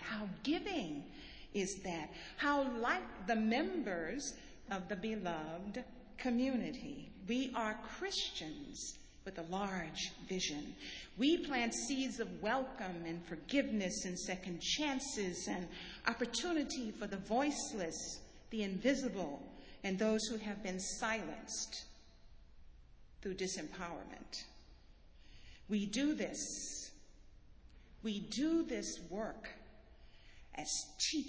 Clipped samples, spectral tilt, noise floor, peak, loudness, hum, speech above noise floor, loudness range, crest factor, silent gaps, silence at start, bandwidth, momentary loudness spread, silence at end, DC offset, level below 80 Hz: under 0.1%; -3.5 dB/octave; -60 dBFS; -16 dBFS; -40 LUFS; none; 21 dB; 5 LU; 24 dB; none; 0 s; 8 kHz; 12 LU; 0 s; under 0.1%; -62 dBFS